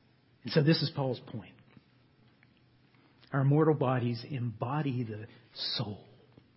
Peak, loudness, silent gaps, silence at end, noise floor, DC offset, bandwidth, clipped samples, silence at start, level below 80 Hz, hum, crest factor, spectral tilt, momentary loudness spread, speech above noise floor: -14 dBFS; -31 LUFS; none; 0.6 s; -65 dBFS; under 0.1%; 5.8 kHz; under 0.1%; 0.45 s; -70 dBFS; none; 20 dB; -10.5 dB/octave; 19 LU; 34 dB